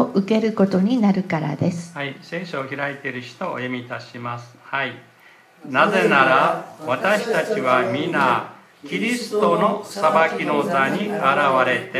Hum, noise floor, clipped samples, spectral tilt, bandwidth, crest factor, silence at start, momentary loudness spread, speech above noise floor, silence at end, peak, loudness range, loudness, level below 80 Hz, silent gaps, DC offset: none; -50 dBFS; under 0.1%; -6 dB/octave; 14.5 kHz; 20 dB; 0 s; 13 LU; 30 dB; 0 s; 0 dBFS; 9 LU; -20 LUFS; -68 dBFS; none; under 0.1%